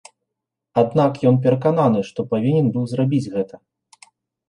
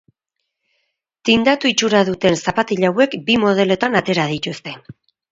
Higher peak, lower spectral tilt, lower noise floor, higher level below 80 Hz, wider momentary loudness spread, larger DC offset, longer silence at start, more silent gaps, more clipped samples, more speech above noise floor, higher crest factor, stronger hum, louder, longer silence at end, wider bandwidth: second, -4 dBFS vs 0 dBFS; first, -9 dB/octave vs -4.5 dB/octave; first, -82 dBFS vs -77 dBFS; second, -60 dBFS vs -52 dBFS; second, 7 LU vs 10 LU; neither; second, 0.75 s vs 1.25 s; neither; neither; about the same, 64 dB vs 61 dB; about the same, 16 dB vs 18 dB; neither; second, -19 LUFS vs -16 LUFS; first, 0.95 s vs 0.4 s; first, 10.5 kHz vs 7.8 kHz